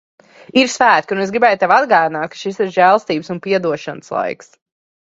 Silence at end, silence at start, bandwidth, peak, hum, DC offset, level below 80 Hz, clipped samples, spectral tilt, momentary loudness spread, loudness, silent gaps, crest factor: 0.7 s; 0.55 s; 8 kHz; 0 dBFS; none; under 0.1%; -62 dBFS; under 0.1%; -4 dB/octave; 12 LU; -15 LUFS; none; 16 dB